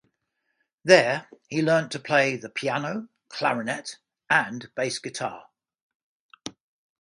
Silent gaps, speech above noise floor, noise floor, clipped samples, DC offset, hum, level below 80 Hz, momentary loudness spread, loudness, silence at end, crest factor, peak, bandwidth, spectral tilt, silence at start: 5.82-6.29 s; 53 dB; -77 dBFS; under 0.1%; under 0.1%; none; -74 dBFS; 20 LU; -24 LUFS; 0.5 s; 24 dB; -2 dBFS; 11.5 kHz; -4 dB/octave; 0.85 s